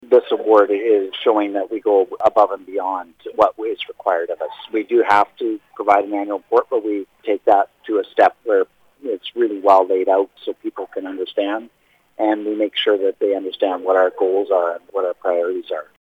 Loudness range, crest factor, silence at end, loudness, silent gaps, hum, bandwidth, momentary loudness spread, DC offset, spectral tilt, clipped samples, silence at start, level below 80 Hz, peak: 2 LU; 16 dB; 0.2 s; -19 LUFS; none; none; 7.8 kHz; 11 LU; under 0.1%; -5 dB/octave; under 0.1%; 0.1 s; -66 dBFS; -2 dBFS